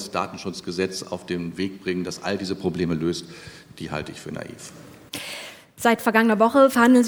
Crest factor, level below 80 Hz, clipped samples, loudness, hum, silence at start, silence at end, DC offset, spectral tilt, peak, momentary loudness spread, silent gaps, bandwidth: 22 dB; -58 dBFS; under 0.1%; -23 LUFS; none; 0 s; 0 s; under 0.1%; -5 dB/octave; -2 dBFS; 21 LU; none; over 20 kHz